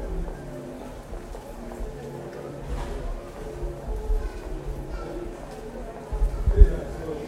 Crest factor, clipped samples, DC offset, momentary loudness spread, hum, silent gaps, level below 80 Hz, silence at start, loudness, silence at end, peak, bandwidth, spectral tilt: 26 dB; under 0.1%; under 0.1%; 15 LU; none; none; -28 dBFS; 0 s; -31 LUFS; 0 s; 0 dBFS; 11.5 kHz; -7.5 dB/octave